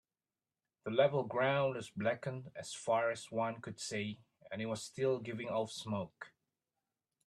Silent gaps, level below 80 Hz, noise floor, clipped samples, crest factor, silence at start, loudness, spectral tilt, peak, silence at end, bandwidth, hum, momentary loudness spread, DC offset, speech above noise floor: none; -78 dBFS; under -90 dBFS; under 0.1%; 22 dB; 0.85 s; -37 LUFS; -5 dB/octave; -16 dBFS; 1 s; 12.5 kHz; none; 14 LU; under 0.1%; over 53 dB